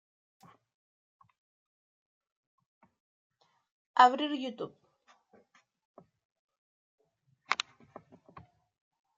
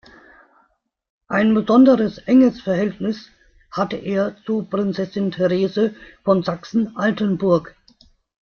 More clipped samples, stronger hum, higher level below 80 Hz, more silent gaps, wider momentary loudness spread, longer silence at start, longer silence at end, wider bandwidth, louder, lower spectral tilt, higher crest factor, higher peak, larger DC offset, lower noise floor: neither; neither; second, -86 dBFS vs -56 dBFS; first, 5.85-5.94 s, 6.25-6.30 s, 6.39-6.49 s, 6.58-6.98 s vs none; first, 20 LU vs 10 LU; first, 3.95 s vs 1.3 s; first, 1.65 s vs 0.8 s; first, 8 kHz vs 6.8 kHz; second, -29 LUFS vs -19 LUFS; second, -2.5 dB/octave vs -8 dB/octave; first, 30 dB vs 16 dB; second, -8 dBFS vs -2 dBFS; neither; first, -73 dBFS vs -64 dBFS